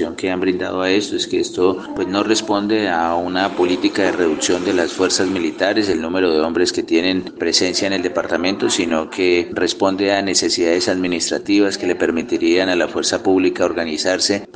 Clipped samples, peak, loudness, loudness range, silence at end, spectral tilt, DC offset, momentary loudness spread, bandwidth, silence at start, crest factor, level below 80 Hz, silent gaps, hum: under 0.1%; -2 dBFS; -17 LUFS; 1 LU; 0.05 s; -3 dB/octave; under 0.1%; 4 LU; 10 kHz; 0 s; 16 dB; -56 dBFS; none; none